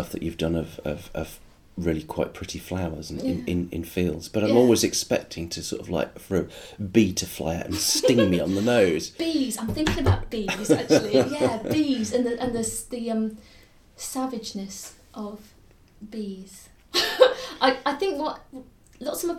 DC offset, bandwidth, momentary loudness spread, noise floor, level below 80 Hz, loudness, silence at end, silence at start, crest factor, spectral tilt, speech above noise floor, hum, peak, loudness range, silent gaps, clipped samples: under 0.1%; 17.5 kHz; 17 LU; -54 dBFS; -46 dBFS; -25 LUFS; 0 s; 0 s; 24 dB; -4.5 dB/octave; 29 dB; none; -2 dBFS; 8 LU; none; under 0.1%